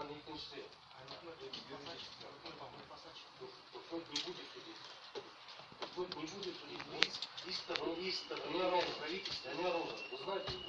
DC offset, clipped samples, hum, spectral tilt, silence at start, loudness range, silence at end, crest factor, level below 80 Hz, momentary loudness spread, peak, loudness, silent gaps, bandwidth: under 0.1%; under 0.1%; none; -3 dB/octave; 0 s; 11 LU; 0 s; 38 dB; -74 dBFS; 17 LU; -6 dBFS; -43 LUFS; none; 11 kHz